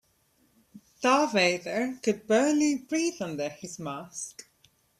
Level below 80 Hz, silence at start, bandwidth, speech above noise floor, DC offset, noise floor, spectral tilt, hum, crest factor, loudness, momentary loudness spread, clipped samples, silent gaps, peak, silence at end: -70 dBFS; 0.75 s; 14.5 kHz; 41 dB; under 0.1%; -68 dBFS; -3.5 dB/octave; none; 20 dB; -27 LUFS; 14 LU; under 0.1%; none; -8 dBFS; 0.6 s